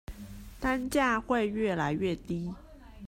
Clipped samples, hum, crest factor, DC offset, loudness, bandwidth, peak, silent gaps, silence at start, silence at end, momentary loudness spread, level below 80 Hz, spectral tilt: under 0.1%; none; 18 dB; under 0.1%; -30 LUFS; 16 kHz; -14 dBFS; none; 0.1 s; 0 s; 19 LU; -48 dBFS; -6 dB/octave